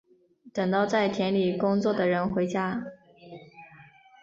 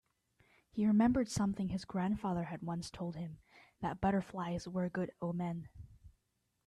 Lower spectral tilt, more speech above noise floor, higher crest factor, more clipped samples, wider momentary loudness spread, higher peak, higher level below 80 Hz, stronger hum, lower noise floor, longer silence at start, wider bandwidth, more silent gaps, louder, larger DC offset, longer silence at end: about the same, -6.5 dB/octave vs -6.5 dB/octave; second, 31 dB vs 47 dB; about the same, 16 dB vs 18 dB; neither; first, 22 LU vs 15 LU; first, -12 dBFS vs -20 dBFS; about the same, -64 dBFS vs -60 dBFS; neither; second, -56 dBFS vs -82 dBFS; second, 0.45 s vs 0.75 s; second, 7.6 kHz vs 12 kHz; neither; first, -26 LUFS vs -37 LUFS; neither; second, 0.4 s vs 0.6 s